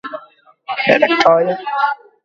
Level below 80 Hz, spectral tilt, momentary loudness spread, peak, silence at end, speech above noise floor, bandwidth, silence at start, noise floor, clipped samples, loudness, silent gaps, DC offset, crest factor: -62 dBFS; -4.5 dB/octave; 16 LU; 0 dBFS; 0.3 s; 32 dB; 7.6 kHz; 0.05 s; -46 dBFS; under 0.1%; -14 LUFS; none; under 0.1%; 16 dB